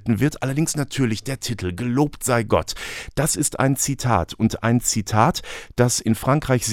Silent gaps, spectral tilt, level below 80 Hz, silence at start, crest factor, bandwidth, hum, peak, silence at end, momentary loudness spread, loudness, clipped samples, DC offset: none; -4.5 dB/octave; -42 dBFS; 0 s; 20 dB; 17.5 kHz; none; -2 dBFS; 0 s; 7 LU; -21 LUFS; under 0.1%; under 0.1%